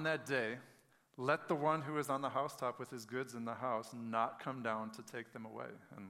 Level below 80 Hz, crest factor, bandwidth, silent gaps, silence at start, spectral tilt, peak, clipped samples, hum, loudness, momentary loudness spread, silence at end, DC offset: -88 dBFS; 22 dB; 16 kHz; none; 0 s; -5.5 dB/octave; -18 dBFS; under 0.1%; none; -40 LUFS; 13 LU; 0 s; under 0.1%